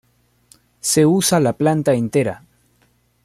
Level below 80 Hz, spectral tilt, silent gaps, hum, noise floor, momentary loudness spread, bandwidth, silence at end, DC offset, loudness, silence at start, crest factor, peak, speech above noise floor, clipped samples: -56 dBFS; -5 dB/octave; none; 60 Hz at -40 dBFS; -60 dBFS; 11 LU; 16 kHz; 0.9 s; under 0.1%; -17 LUFS; 0.85 s; 16 dB; -4 dBFS; 44 dB; under 0.1%